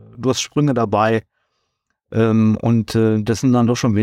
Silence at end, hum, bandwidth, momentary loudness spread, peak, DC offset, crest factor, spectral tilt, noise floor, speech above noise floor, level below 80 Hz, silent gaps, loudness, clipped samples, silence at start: 0 s; none; 13.5 kHz; 5 LU; -4 dBFS; under 0.1%; 12 dB; -6.5 dB/octave; -72 dBFS; 56 dB; -52 dBFS; none; -17 LUFS; under 0.1%; 0.15 s